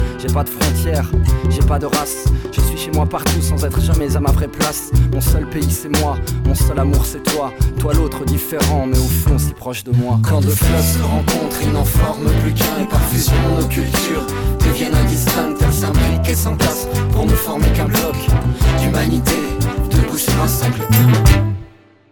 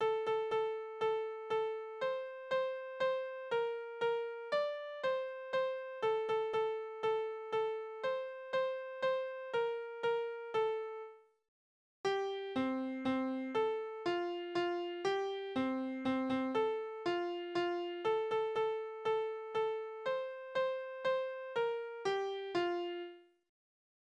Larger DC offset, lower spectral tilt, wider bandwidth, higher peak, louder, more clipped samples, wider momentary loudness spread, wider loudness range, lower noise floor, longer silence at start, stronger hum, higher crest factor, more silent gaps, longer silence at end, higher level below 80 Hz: neither; about the same, -5.5 dB/octave vs -5 dB/octave; first, 19 kHz vs 8.6 kHz; first, 0 dBFS vs -24 dBFS; first, -16 LUFS vs -37 LUFS; neither; about the same, 4 LU vs 4 LU; about the same, 2 LU vs 2 LU; second, -40 dBFS vs under -90 dBFS; about the same, 0 s vs 0 s; neither; about the same, 14 dB vs 14 dB; second, none vs 11.48-12.04 s; second, 0.45 s vs 0.8 s; first, -20 dBFS vs -80 dBFS